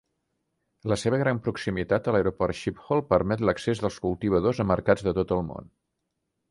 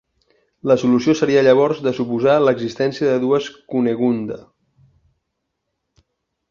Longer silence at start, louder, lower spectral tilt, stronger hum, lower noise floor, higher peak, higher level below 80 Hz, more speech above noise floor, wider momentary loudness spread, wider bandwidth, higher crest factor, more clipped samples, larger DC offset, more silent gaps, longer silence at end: first, 0.85 s vs 0.65 s; second, -26 LUFS vs -17 LUFS; about the same, -7 dB/octave vs -6.5 dB/octave; neither; first, -80 dBFS vs -76 dBFS; second, -6 dBFS vs -2 dBFS; first, -48 dBFS vs -60 dBFS; second, 55 dB vs 59 dB; second, 6 LU vs 10 LU; first, 11.5 kHz vs 7.4 kHz; about the same, 20 dB vs 18 dB; neither; neither; neither; second, 0.85 s vs 2.1 s